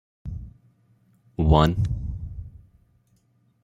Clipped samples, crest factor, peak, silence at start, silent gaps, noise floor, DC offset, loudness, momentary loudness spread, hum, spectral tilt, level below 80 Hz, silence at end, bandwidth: under 0.1%; 24 dB; -2 dBFS; 0.25 s; none; -64 dBFS; under 0.1%; -23 LUFS; 23 LU; none; -8 dB/octave; -34 dBFS; 1.05 s; 15 kHz